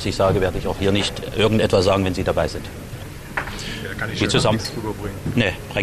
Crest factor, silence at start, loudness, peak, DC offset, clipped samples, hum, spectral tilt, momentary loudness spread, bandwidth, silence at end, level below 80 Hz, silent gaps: 16 dB; 0 s; -21 LUFS; -6 dBFS; under 0.1%; under 0.1%; none; -5 dB/octave; 12 LU; 14 kHz; 0 s; -36 dBFS; none